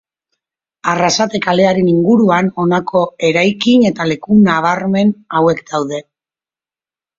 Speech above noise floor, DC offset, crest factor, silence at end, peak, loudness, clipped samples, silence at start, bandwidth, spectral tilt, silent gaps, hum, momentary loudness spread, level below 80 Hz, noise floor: over 77 dB; under 0.1%; 14 dB; 1.2 s; 0 dBFS; -13 LUFS; under 0.1%; 0.85 s; 7.6 kHz; -5.5 dB/octave; none; none; 8 LU; -54 dBFS; under -90 dBFS